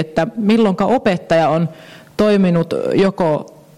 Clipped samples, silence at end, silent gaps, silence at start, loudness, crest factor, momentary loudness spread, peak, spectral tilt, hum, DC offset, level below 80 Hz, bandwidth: under 0.1%; 0.3 s; none; 0 s; -16 LUFS; 10 dB; 6 LU; -6 dBFS; -7.5 dB/octave; none; 0.4%; -50 dBFS; 12 kHz